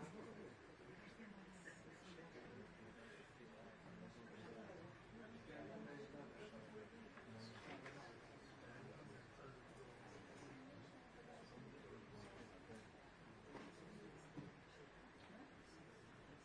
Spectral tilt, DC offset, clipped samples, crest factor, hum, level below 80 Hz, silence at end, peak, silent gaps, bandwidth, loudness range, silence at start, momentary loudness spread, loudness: -5.5 dB/octave; under 0.1%; under 0.1%; 16 dB; none; -78 dBFS; 0 s; -42 dBFS; none; 10 kHz; 3 LU; 0 s; 6 LU; -60 LUFS